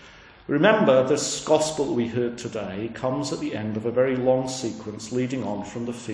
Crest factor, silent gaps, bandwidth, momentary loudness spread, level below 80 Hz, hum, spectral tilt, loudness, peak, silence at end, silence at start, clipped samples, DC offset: 20 dB; none; 10.5 kHz; 13 LU; -58 dBFS; none; -5 dB/octave; -24 LUFS; -4 dBFS; 0 s; 0 s; under 0.1%; under 0.1%